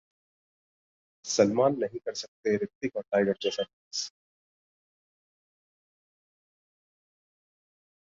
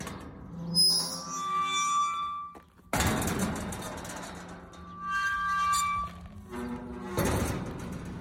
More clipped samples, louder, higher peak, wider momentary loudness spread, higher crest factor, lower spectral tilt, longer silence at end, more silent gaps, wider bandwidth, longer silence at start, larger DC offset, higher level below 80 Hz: neither; about the same, -29 LUFS vs -29 LUFS; first, -8 dBFS vs -12 dBFS; second, 11 LU vs 17 LU; about the same, 24 dB vs 20 dB; about the same, -4 dB/octave vs -3 dB/octave; first, 3.95 s vs 0 s; first, 2.28-2.43 s, 2.75-2.81 s, 3.73-3.91 s vs none; second, 7.8 kHz vs 16.5 kHz; first, 1.25 s vs 0 s; neither; second, -72 dBFS vs -46 dBFS